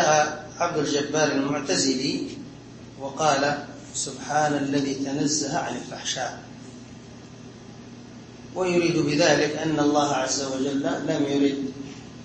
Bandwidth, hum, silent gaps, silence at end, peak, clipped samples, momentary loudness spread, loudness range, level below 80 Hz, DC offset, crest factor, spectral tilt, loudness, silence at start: 8.8 kHz; none; none; 0 s; -6 dBFS; under 0.1%; 21 LU; 7 LU; -60 dBFS; under 0.1%; 18 dB; -3.5 dB/octave; -24 LUFS; 0 s